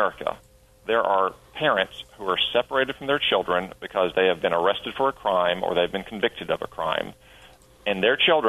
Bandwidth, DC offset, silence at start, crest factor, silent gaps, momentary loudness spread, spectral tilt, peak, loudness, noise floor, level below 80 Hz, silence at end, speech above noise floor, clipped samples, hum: 13.5 kHz; under 0.1%; 0 s; 18 dB; none; 8 LU; -5 dB/octave; -6 dBFS; -24 LUFS; -51 dBFS; -56 dBFS; 0 s; 27 dB; under 0.1%; none